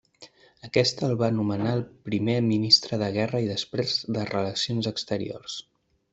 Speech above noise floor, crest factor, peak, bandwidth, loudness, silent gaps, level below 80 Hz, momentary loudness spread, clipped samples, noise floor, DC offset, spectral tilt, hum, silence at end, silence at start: 27 dB; 22 dB; -4 dBFS; 8.2 kHz; -25 LUFS; none; -62 dBFS; 12 LU; under 0.1%; -53 dBFS; under 0.1%; -5 dB/octave; none; 0.5 s; 0.2 s